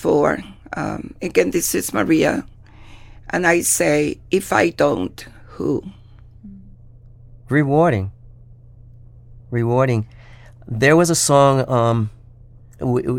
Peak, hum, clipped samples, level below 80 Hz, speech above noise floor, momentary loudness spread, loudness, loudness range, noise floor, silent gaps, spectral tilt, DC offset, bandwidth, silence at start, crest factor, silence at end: -2 dBFS; none; under 0.1%; -46 dBFS; 26 dB; 14 LU; -18 LUFS; 6 LU; -44 dBFS; none; -5 dB/octave; under 0.1%; 17 kHz; 0 s; 18 dB; 0 s